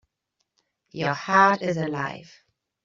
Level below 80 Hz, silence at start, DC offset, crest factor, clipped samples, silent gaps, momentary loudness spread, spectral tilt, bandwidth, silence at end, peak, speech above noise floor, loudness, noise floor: -68 dBFS; 0.95 s; under 0.1%; 22 dB; under 0.1%; none; 19 LU; -4 dB/octave; 7.6 kHz; 0.6 s; -4 dBFS; 55 dB; -23 LUFS; -78 dBFS